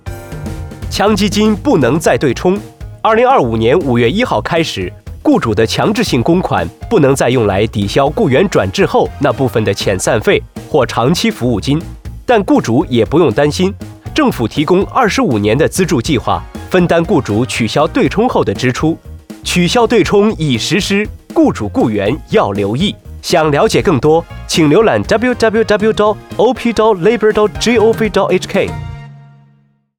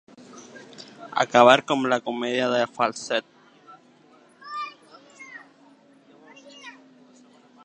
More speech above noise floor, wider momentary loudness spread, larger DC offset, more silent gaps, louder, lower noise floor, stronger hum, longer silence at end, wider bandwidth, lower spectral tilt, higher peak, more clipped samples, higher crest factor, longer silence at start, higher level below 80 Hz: first, 40 dB vs 34 dB; second, 7 LU vs 28 LU; neither; neither; first, -12 LUFS vs -22 LUFS; about the same, -52 dBFS vs -55 dBFS; neither; second, 0.75 s vs 0.95 s; first, 20 kHz vs 9.6 kHz; first, -5.5 dB/octave vs -3.5 dB/octave; about the same, -2 dBFS vs 0 dBFS; neither; second, 12 dB vs 26 dB; second, 0.05 s vs 0.35 s; first, -34 dBFS vs -76 dBFS